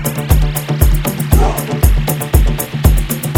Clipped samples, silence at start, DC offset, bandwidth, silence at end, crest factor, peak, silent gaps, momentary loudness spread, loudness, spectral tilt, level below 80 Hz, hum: 0.1%; 0 s; under 0.1%; 17.5 kHz; 0 s; 12 dB; 0 dBFS; none; 3 LU; -14 LUFS; -5.5 dB/octave; -14 dBFS; none